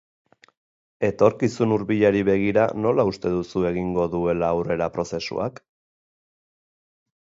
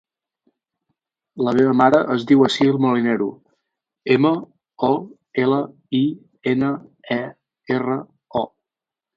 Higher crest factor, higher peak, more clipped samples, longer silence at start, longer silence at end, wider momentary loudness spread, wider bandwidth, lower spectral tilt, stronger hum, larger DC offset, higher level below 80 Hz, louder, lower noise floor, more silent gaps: about the same, 20 dB vs 20 dB; second, -4 dBFS vs 0 dBFS; neither; second, 1 s vs 1.35 s; first, 1.9 s vs 0.7 s; second, 8 LU vs 12 LU; about the same, 7.8 kHz vs 7.8 kHz; about the same, -7 dB/octave vs -7 dB/octave; neither; neither; first, -50 dBFS vs -62 dBFS; about the same, -22 LUFS vs -20 LUFS; about the same, under -90 dBFS vs -88 dBFS; neither